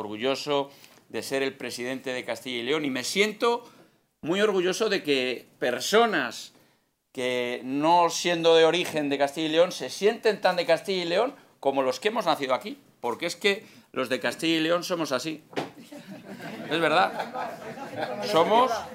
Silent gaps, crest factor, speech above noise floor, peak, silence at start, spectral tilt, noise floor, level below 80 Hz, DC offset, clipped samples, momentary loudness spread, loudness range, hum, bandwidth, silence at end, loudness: none; 20 dB; 41 dB; -6 dBFS; 0 s; -3.5 dB/octave; -67 dBFS; -78 dBFS; under 0.1%; under 0.1%; 14 LU; 5 LU; none; 16 kHz; 0 s; -26 LUFS